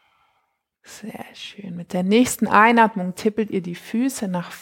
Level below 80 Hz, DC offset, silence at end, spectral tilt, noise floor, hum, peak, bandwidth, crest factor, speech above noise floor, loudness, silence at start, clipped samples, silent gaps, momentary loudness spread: -60 dBFS; under 0.1%; 0 s; -5 dB/octave; -71 dBFS; none; -2 dBFS; 17 kHz; 20 dB; 50 dB; -19 LUFS; 0.9 s; under 0.1%; none; 21 LU